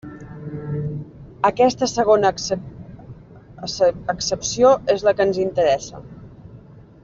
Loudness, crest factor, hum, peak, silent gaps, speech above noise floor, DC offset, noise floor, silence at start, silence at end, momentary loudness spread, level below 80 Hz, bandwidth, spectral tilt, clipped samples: -19 LUFS; 18 dB; none; -4 dBFS; none; 25 dB; under 0.1%; -43 dBFS; 0.05 s; 0.25 s; 22 LU; -50 dBFS; 7.6 kHz; -4.5 dB/octave; under 0.1%